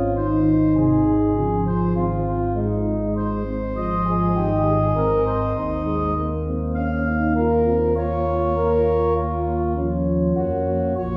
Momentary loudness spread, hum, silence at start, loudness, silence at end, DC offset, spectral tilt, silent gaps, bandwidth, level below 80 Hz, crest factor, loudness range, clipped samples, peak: 6 LU; none; 0 s; -21 LUFS; 0 s; under 0.1%; -12 dB/octave; none; 5.2 kHz; -30 dBFS; 12 dB; 2 LU; under 0.1%; -8 dBFS